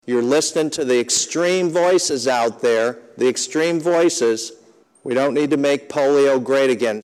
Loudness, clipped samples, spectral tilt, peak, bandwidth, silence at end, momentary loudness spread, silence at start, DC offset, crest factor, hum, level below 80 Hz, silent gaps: -18 LUFS; under 0.1%; -3 dB/octave; -4 dBFS; 14.5 kHz; 0 s; 5 LU; 0.05 s; under 0.1%; 14 dB; none; -72 dBFS; none